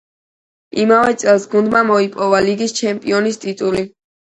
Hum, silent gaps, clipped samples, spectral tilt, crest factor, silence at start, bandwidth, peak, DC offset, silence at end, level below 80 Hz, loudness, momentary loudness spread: none; none; under 0.1%; -4.5 dB/octave; 16 dB; 0.75 s; 11 kHz; 0 dBFS; under 0.1%; 0.45 s; -54 dBFS; -15 LUFS; 8 LU